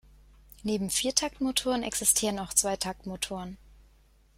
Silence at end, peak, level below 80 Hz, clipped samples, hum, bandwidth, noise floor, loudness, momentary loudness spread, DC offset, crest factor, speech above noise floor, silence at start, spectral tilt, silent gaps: 0.8 s; -8 dBFS; -54 dBFS; under 0.1%; none; 16.5 kHz; -61 dBFS; -28 LUFS; 11 LU; under 0.1%; 24 dB; 31 dB; 0.65 s; -2 dB/octave; none